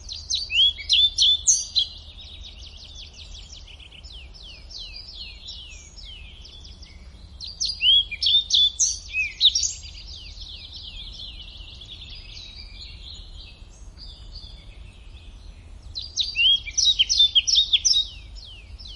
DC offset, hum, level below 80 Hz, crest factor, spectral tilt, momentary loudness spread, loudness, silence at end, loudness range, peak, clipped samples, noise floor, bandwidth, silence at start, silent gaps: under 0.1%; none; -44 dBFS; 20 dB; 2 dB/octave; 25 LU; -18 LUFS; 0 s; 21 LU; -6 dBFS; under 0.1%; -43 dBFS; 11.5 kHz; 0 s; none